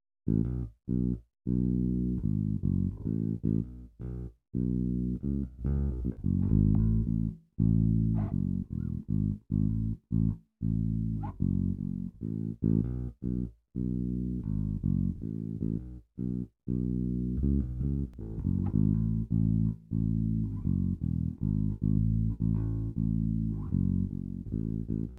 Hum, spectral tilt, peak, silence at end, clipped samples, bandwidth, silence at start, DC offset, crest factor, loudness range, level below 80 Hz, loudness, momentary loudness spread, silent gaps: none; -13 dB/octave; -12 dBFS; 0 s; under 0.1%; 1.6 kHz; 0.25 s; under 0.1%; 18 dB; 4 LU; -38 dBFS; -31 LUFS; 8 LU; none